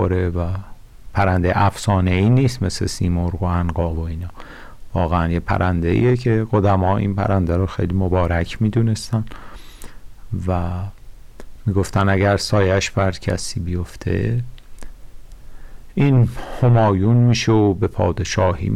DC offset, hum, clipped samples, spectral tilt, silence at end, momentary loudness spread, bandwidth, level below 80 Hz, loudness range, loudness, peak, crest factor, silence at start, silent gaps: under 0.1%; none; under 0.1%; -6.5 dB/octave; 0 s; 11 LU; 12.5 kHz; -34 dBFS; 5 LU; -19 LUFS; -8 dBFS; 10 dB; 0 s; none